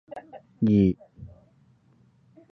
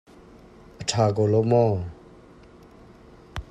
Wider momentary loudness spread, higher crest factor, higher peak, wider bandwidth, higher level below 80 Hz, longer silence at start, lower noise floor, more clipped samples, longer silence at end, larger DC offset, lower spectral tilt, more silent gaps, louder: first, 27 LU vs 19 LU; about the same, 18 dB vs 18 dB; about the same, -10 dBFS vs -8 dBFS; second, 4.8 kHz vs 10 kHz; about the same, -50 dBFS vs -50 dBFS; second, 0.15 s vs 0.8 s; first, -61 dBFS vs -49 dBFS; neither; first, 1.25 s vs 0.1 s; neither; first, -11 dB/octave vs -6 dB/octave; neither; about the same, -24 LUFS vs -22 LUFS